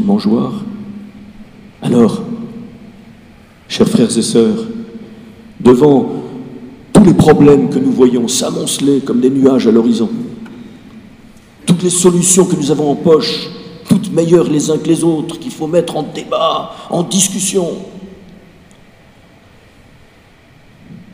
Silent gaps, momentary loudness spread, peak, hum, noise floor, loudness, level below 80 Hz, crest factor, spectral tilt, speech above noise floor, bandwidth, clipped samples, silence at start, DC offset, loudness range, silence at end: none; 20 LU; 0 dBFS; none; -44 dBFS; -12 LUFS; -44 dBFS; 14 dB; -5 dB/octave; 33 dB; 16 kHz; 0.3%; 0 s; under 0.1%; 8 LU; 0.1 s